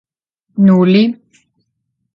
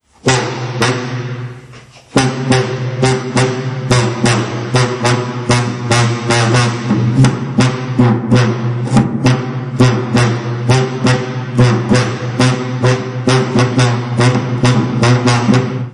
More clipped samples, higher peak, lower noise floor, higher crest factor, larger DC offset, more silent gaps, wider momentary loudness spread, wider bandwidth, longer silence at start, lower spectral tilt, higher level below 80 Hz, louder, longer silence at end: neither; about the same, 0 dBFS vs 0 dBFS; first, -70 dBFS vs -37 dBFS; about the same, 14 dB vs 12 dB; neither; neither; first, 19 LU vs 6 LU; second, 5.6 kHz vs 11 kHz; first, 0.55 s vs 0.25 s; first, -9.5 dB/octave vs -5.5 dB/octave; second, -58 dBFS vs -40 dBFS; first, -11 LUFS vs -14 LUFS; first, 1.05 s vs 0 s